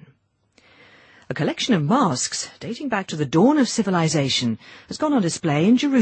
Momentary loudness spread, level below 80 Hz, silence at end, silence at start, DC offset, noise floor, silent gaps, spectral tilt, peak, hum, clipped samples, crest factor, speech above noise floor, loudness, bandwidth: 12 LU; -60 dBFS; 0 s; 1.3 s; under 0.1%; -61 dBFS; none; -5 dB/octave; -6 dBFS; none; under 0.1%; 16 dB; 41 dB; -21 LUFS; 8.8 kHz